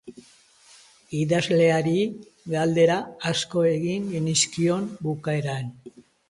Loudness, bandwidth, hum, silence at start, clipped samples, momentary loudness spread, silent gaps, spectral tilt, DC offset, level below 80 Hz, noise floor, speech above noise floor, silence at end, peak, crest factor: -24 LUFS; 11.5 kHz; none; 0.05 s; under 0.1%; 10 LU; none; -5 dB/octave; under 0.1%; -62 dBFS; -55 dBFS; 32 dB; 0.4 s; -8 dBFS; 16 dB